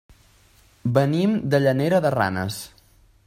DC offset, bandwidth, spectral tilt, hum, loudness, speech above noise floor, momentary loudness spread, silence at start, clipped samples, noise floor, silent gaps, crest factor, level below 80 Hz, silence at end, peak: under 0.1%; 16 kHz; -7 dB/octave; none; -21 LUFS; 35 dB; 11 LU; 0.85 s; under 0.1%; -56 dBFS; none; 18 dB; -56 dBFS; 0.6 s; -4 dBFS